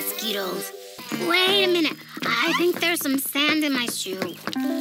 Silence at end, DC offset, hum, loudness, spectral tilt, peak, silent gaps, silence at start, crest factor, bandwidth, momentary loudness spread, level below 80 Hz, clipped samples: 0 s; under 0.1%; none; -22 LUFS; -2.5 dB/octave; -6 dBFS; none; 0 s; 18 dB; 19 kHz; 11 LU; -84 dBFS; under 0.1%